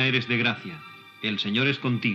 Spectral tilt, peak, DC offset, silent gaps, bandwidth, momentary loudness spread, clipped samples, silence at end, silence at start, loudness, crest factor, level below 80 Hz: -6.5 dB/octave; -10 dBFS; under 0.1%; none; 7.6 kHz; 17 LU; under 0.1%; 0 s; 0 s; -25 LUFS; 16 dB; -78 dBFS